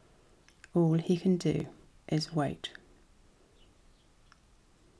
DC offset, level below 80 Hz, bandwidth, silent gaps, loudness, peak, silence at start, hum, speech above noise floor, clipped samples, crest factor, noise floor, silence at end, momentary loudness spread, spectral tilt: under 0.1%; -62 dBFS; 11 kHz; none; -31 LUFS; -16 dBFS; 0.75 s; none; 33 dB; under 0.1%; 18 dB; -63 dBFS; 2.3 s; 15 LU; -7 dB/octave